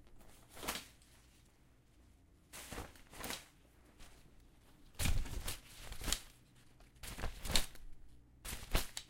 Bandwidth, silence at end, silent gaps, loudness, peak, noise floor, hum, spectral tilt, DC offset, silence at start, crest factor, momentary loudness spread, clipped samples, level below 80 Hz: 16.5 kHz; 0 s; none; -43 LUFS; -12 dBFS; -67 dBFS; none; -2.5 dB/octave; under 0.1%; 0.05 s; 32 dB; 26 LU; under 0.1%; -48 dBFS